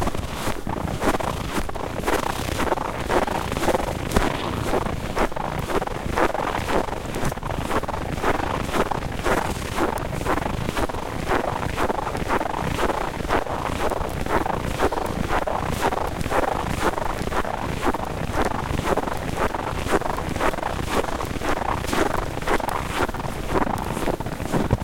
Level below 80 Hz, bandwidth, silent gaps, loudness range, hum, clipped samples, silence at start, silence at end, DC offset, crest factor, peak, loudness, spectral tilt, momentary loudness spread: -34 dBFS; 17 kHz; none; 1 LU; none; under 0.1%; 0 s; 0 s; under 0.1%; 22 dB; -2 dBFS; -25 LUFS; -5 dB/octave; 4 LU